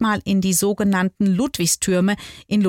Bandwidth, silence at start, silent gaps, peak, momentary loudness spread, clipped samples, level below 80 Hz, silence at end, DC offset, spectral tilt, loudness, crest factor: 17 kHz; 0 s; none; -8 dBFS; 4 LU; under 0.1%; -50 dBFS; 0 s; under 0.1%; -4.5 dB/octave; -19 LUFS; 12 dB